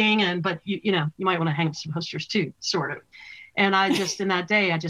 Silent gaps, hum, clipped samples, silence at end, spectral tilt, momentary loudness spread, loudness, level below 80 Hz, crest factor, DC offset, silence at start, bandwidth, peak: none; none; under 0.1%; 0 s; -4.5 dB/octave; 11 LU; -24 LUFS; -68 dBFS; 20 dB; under 0.1%; 0 s; 14.5 kHz; -4 dBFS